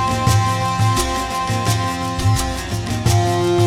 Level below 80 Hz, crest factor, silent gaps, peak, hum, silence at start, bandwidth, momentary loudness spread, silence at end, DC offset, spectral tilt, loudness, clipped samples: -32 dBFS; 16 dB; none; -2 dBFS; none; 0 s; 16 kHz; 5 LU; 0 s; under 0.1%; -5 dB/octave; -18 LUFS; under 0.1%